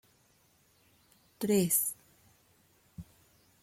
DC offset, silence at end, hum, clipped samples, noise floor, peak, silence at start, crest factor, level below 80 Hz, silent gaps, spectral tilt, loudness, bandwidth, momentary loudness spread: under 0.1%; 0.6 s; none; under 0.1%; -68 dBFS; -16 dBFS; 1.4 s; 22 dB; -70 dBFS; none; -4.5 dB/octave; -29 LUFS; 16.5 kHz; 27 LU